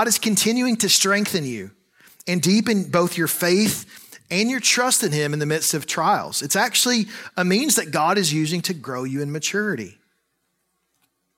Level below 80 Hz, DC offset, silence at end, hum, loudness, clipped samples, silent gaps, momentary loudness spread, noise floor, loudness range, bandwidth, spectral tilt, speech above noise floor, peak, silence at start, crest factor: -66 dBFS; under 0.1%; 1.45 s; none; -20 LUFS; under 0.1%; none; 11 LU; -72 dBFS; 3 LU; 16.5 kHz; -3 dB/octave; 52 dB; -4 dBFS; 0 s; 18 dB